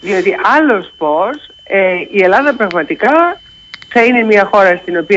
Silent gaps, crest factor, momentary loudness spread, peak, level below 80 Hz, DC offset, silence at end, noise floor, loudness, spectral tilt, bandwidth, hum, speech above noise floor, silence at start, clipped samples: none; 12 dB; 7 LU; 0 dBFS; -52 dBFS; under 0.1%; 0 s; -33 dBFS; -11 LUFS; -5.5 dB/octave; 8 kHz; none; 22 dB; 0 s; under 0.1%